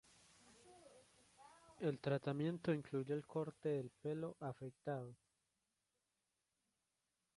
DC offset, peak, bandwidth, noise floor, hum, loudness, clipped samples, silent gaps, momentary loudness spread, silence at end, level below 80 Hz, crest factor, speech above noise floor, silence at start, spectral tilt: under 0.1%; -28 dBFS; 11.5 kHz; -89 dBFS; none; -44 LUFS; under 0.1%; none; 24 LU; 2.2 s; -82 dBFS; 20 dB; 46 dB; 0.45 s; -7.5 dB/octave